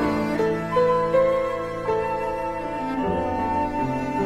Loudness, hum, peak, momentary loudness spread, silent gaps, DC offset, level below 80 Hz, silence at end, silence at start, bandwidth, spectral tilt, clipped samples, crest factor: -24 LUFS; none; -10 dBFS; 7 LU; none; under 0.1%; -44 dBFS; 0 s; 0 s; 13.5 kHz; -7 dB/octave; under 0.1%; 14 dB